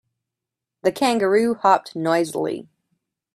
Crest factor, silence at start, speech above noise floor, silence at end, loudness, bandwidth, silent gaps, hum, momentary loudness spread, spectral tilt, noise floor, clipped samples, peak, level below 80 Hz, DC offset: 20 dB; 0.85 s; 66 dB; 0.75 s; -20 LUFS; 15 kHz; none; none; 9 LU; -5 dB/octave; -85 dBFS; under 0.1%; -2 dBFS; -68 dBFS; under 0.1%